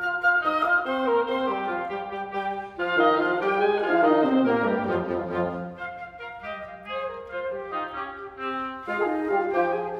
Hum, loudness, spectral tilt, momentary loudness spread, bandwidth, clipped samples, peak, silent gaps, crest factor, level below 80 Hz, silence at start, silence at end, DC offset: none; -25 LUFS; -7 dB/octave; 14 LU; 11.5 kHz; under 0.1%; -10 dBFS; none; 16 dB; -60 dBFS; 0 s; 0 s; under 0.1%